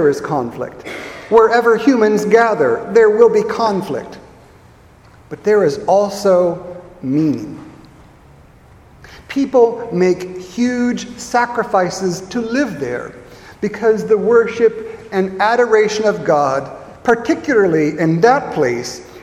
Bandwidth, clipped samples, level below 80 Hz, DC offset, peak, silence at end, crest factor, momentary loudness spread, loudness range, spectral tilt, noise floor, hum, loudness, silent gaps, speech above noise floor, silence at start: 13 kHz; under 0.1%; -50 dBFS; under 0.1%; 0 dBFS; 0 s; 16 dB; 14 LU; 6 LU; -5.5 dB/octave; -44 dBFS; none; -15 LUFS; none; 30 dB; 0 s